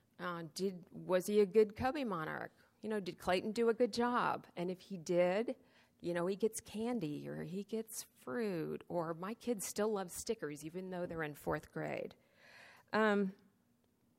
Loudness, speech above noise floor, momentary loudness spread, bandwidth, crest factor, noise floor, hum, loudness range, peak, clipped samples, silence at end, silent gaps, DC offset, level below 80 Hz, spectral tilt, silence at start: -38 LUFS; 38 dB; 12 LU; 16 kHz; 20 dB; -75 dBFS; none; 5 LU; -20 dBFS; under 0.1%; 0.85 s; none; under 0.1%; -70 dBFS; -5 dB/octave; 0.2 s